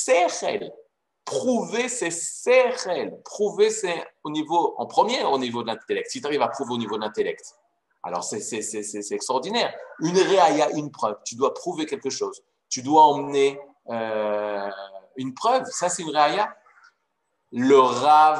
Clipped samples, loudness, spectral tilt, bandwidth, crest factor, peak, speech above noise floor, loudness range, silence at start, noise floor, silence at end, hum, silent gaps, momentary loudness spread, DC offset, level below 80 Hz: under 0.1%; -23 LUFS; -3 dB/octave; 12 kHz; 20 dB; -4 dBFS; 53 dB; 5 LU; 0 s; -75 dBFS; 0 s; none; none; 13 LU; under 0.1%; -78 dBFS